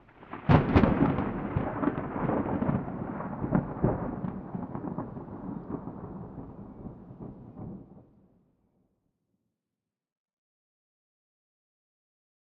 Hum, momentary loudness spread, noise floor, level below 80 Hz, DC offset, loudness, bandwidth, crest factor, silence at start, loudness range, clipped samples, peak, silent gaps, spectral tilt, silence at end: none; 21 LU; -89 dBFS; -46 dBFS; under 0.1%; -30 LUFS; 6 kHz; 26 dB; 0.2 s; 21 LU; under 0.1%; -6 dBFS; none; -8 dB/octave; 4.5 s